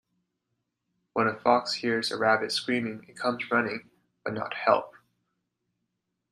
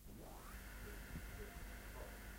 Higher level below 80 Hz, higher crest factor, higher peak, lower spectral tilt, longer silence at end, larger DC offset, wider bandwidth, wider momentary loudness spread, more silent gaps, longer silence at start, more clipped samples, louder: second, -72 dBFS vs -54 dBFS; first, 24 dB vs 14 dB; first, -6 dBFS vs -38 dBFS; about the same, -4 dB/octave vs -4.5 dB/octave; first, 1.4 s vs 0 s; neither; second, 13.5 kHz vs 16 kHz; first, 11 LU vs 3 LU; neither; first, 1.15 s vs 0 s; neither; first, -27 LUFS vs -54 LUFS